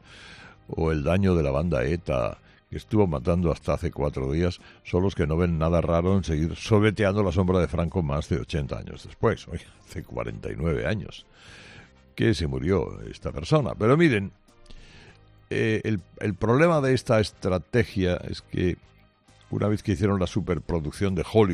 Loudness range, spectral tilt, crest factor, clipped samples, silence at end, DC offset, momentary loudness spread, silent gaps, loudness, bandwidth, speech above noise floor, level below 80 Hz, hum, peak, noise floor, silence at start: 5 LU; -7 dB/octave; 20 dB; under 0.1%; 0 s; under 0.1%; 15 LU; none; -25 LUFS; 11.5 kHz; 32 dB; -42 dBFS; none; -6 dBFS; -57 dBFS; 0.1 s